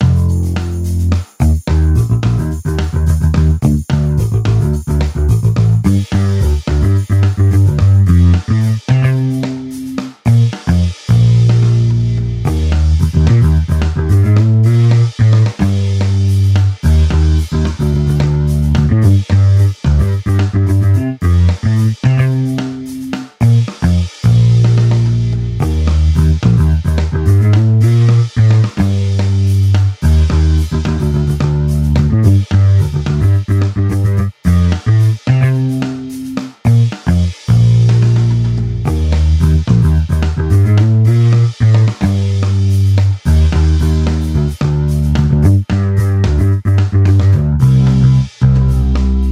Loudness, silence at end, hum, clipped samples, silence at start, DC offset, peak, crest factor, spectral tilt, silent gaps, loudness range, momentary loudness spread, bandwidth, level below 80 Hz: -12 LUFS; 0 s; none; under 0.1%; 0 s; under 0.1%; 0 dBFS; 10 dB; -8 dB/octave; none; 2 LU; 6 LU; 12 kHz; -20 dBFS